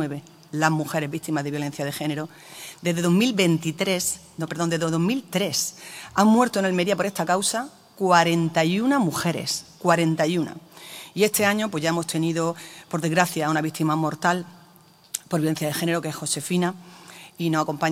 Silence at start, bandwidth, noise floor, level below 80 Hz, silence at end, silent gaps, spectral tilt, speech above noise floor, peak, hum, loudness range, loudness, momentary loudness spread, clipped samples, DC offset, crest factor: 0 s; 16 kHz; -53 dBFS; -68 dBFS; 0 s; none; -4.5 dB/octave; 30 dB; -2 dBFS; none; 4 LU; -23 LUFS; 14 LU; under 0.1%; under 0.1%; 22 dB